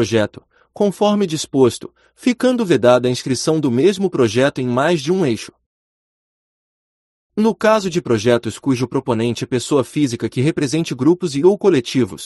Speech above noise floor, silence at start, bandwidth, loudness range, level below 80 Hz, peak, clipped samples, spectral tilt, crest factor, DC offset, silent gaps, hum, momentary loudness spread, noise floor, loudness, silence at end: over 74 dB; 0 s; 12 kHz; 5 LU; -56 dBFS; 0 dBFS; under 0.1%; -5.5 dB/octave; 16 dB; under 0.1%; 5.66-7.30 s; none; 6 LU; under -90 dBFS; -17 LUFS; 0 s